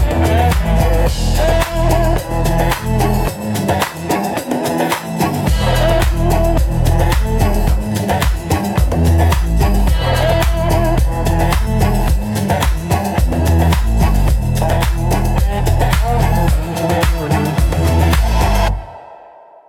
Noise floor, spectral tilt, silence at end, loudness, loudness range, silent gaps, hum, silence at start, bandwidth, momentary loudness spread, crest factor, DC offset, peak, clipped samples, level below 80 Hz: -40 dBFS; -6 dB/octave; 0.45 s; -15 LUFS; 2 LU; none; none; 0 s; 17.5 kHz; 4 LU; 12 dB; under 0.1%; -2 dBFS; under 0.1%; -18 dBFS